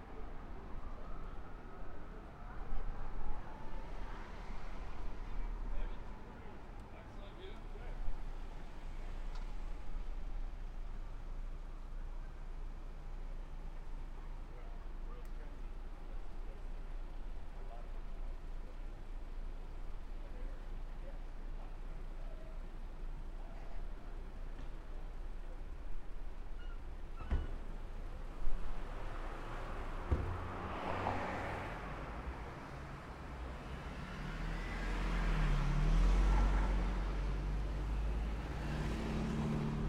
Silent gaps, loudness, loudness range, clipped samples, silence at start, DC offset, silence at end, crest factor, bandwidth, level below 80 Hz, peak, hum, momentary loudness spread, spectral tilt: none; -45 LUFS; 14 LU; under 0.1%; 0 s; under 0.1%; 0 s; 18 dB; 9.4 kHz; -40 dBFS; -20 dBFS; none; 14 LU; -6.5 dB/octave